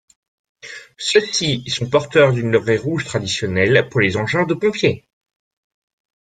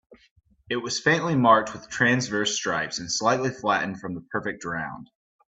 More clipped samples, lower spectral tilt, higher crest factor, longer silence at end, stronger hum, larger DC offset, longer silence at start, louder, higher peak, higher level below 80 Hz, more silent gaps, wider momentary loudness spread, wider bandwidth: neither; about the same, -4.5 dB/octave vs -4 dB/octave; about the same, 18 dB vs 22 dB; first, 1.3 s vs 0.45 s; neither; neither; first, 0.65 s vs 0.1 s; first, -17 LUFS vs -24 LUFS; first, 0 dBFS vs -4 dBFS; first, -54 dBFS vs -62 dBFS; second, none vs 0.31-0.36 s; second, 9 LU vs 12 LU; first, 9.4 kHz vs 8.4 kHz